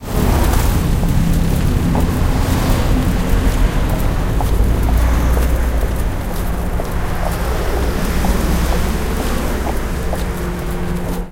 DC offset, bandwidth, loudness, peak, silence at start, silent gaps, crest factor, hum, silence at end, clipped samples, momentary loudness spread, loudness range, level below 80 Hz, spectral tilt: under 0.1%; 17 kHz; -18 LUFS; -2 dBFS; 0 s; none; 14 dB; none; 0 s; under 0.1%; 6 LU; 3 LU; -18 dBFS; -6 dB/octave